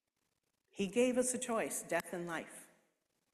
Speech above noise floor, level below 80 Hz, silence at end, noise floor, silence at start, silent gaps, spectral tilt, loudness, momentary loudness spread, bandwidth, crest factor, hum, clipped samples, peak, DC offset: 48 dB; -76 dBFS; 0.7 s; -85 dBFS; 0.75 s; none; -3.5 dB/octave; -37 LUFS; 19 LU; 14 kHz; 18 dB; none; under 0.1%; -20 dBFS; under 0.1%